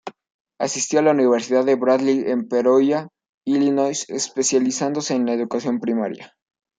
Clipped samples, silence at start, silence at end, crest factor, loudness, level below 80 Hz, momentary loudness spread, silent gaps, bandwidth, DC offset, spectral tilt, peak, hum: under 0.1%; 0.05 s; 0.55 s; 16 dB; -20 LUFS; -70 dBFS; 9 LU; 0.34-0.45 s, 3.29-3.41 s; 9.4 kHz; under 0.1%; -4 dB/octave; -4 dBFS; none